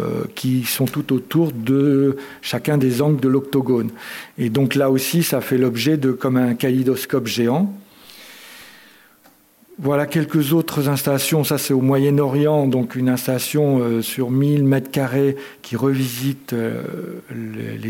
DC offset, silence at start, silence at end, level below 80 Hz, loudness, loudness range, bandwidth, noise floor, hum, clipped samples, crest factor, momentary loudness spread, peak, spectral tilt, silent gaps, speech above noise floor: under 0.1%; 0 s; 0 s; -66 dBFS; -19 LUFS; 5 LU; 17 kHz; -53 dBFS; none; under 0.1%; 14 dB; 12 LU; -6 dBFS; -6 dB/octave; none; 34 dB